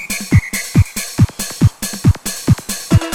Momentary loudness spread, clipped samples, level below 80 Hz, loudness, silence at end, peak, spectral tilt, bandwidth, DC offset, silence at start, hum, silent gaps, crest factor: 2 LU; under 0.1%; -28 dBFS; -16 LUFS; 0 s; 0 dBFS; -5 dB/octave; 18.5 kHz; under 0.1%; 0 s; none; none; 14 dB